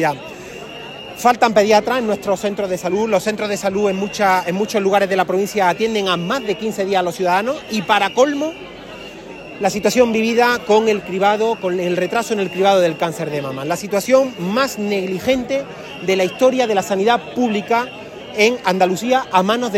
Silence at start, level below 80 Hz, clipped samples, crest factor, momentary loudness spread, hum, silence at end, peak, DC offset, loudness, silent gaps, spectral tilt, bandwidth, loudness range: 0 s; -54 dBFS; under 0.1%; 16 dB; 12 LU; none; 0 s; 0 dBFS; under 0.1%; -17 LUFS; none; -4.5 dB/octave; 16.5 kHz; 2 LU